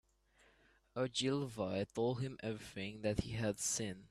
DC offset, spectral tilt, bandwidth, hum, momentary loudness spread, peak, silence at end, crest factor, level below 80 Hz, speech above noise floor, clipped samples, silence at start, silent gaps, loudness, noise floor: under 0.1%; -4.5 dB/octave; 14.5 kHz; none; 8 LU; -20 dBFS; 0.05 s; 20 dB; -62 dBFS; 32 dB; under 0.1%; 0.95 s; none; -40 LUFS; -71 dBFS